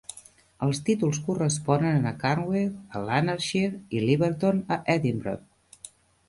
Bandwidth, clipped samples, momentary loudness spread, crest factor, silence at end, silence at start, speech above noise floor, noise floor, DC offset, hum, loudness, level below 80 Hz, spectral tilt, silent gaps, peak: 11.5 kHz; under 0.1%; 13 LU; 20 dB; 0.4 s; 0.1 s; 26 dB; -52 dBFS; under 0.1%; none; -26 LUFS; -58 dBFS; -6 dB/octave; none; -8 dBFS